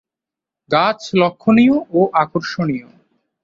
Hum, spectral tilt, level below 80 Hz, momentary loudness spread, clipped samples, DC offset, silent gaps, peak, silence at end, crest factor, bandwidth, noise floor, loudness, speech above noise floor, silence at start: none; -6.5 dB/octave; -58 dBFS; 9 LU; under 0.1%; under 0.1%; none; -2 dBFS; 0.65 s; 16 dB; 7.6 kHz; -86 dBFS; -16 LUFS; 71 dB; 0.7 s